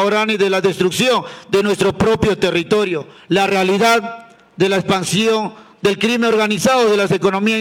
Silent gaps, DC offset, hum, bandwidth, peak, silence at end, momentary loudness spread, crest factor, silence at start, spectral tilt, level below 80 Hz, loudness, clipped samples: none; under 0.1%; none; 17.5 kHz; -4 dBFS; 0 s; 6 LU; 12 dB; 0 s; -4.5 dB/octave; -46 dBFS; -16 LUFS; under 0.1%